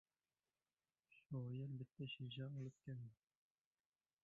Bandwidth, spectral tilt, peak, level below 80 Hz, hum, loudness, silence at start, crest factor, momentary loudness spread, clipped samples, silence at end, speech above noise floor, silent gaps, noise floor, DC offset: 7.2 kHz; -6.5 dB/octave; -40 dBFS; -84 dBFS; none; -52 LUFS; 1.1 s; 16 dB; 5 LU; under 0.1%; 1.1 s; over 39 dB; none; under -90 dBFS; under 0.1%